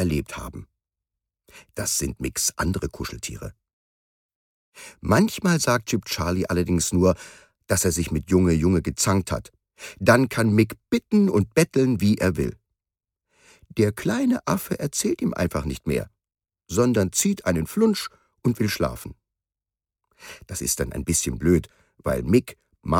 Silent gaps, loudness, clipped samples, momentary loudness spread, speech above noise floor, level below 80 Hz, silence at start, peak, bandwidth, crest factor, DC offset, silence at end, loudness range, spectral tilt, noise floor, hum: 3.73-4.29 s, 4.35-4.72 s; -23 LUFS; under 0.1%; 15 LU; over 67 dB; -42 dBFS; 0 s; -4 dBFS; 17.5 kHz; 20 dB; under 0.1%; 0 s; 7 LU; -5 dB/octave; under -90 dBFS; none